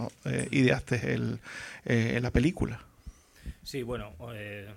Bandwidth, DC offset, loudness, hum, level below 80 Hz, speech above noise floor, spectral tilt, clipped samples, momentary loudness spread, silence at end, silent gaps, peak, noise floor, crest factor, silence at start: 15 kHz; under 0.1%; -30 LUFS; none; -44 dBFS; 20 dB; -6 dB/octave; under 0.1%; 16 LU; 0 s; none; -10 dBFS; -50 dBFS; 20 dB; 0 s